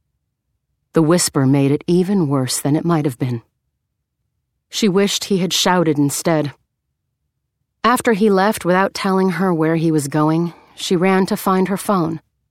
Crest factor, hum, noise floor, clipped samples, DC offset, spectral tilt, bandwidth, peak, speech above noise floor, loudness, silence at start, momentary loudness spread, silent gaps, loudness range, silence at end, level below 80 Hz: 16 dB; none; -74 dBFS; under 0.1%; under 0.1%; -5 dB/octave; 16.5 kHz; 0 dBFS; 58 dB; -17 LUFS; 0.95 s; 7 LU; none; 3 LU; 0.35 s; -58 dBFS